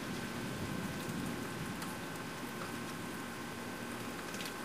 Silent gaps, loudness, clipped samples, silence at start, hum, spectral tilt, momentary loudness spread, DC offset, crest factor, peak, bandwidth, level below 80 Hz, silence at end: none; -41 LUFS; under 0.1%; 0 s; none; -4 dB/octave; 3 LU; 0.1%; 14 dB; -26 dBFS; 15.5 kHz; -62 dBFS; 0 s